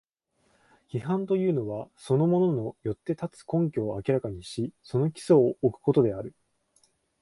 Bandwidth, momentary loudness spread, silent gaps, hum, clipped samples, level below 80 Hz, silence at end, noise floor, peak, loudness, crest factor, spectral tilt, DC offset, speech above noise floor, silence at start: 11.5 kHz; 13 LU; none; none; under 0.1%; -60 dBFS; 0.9 s; -71 dBFS; -10 dBFS; -27 LUFS; 18 dB; -8.5 dB/octave; under 0.1%; 45 dB; 0.95 s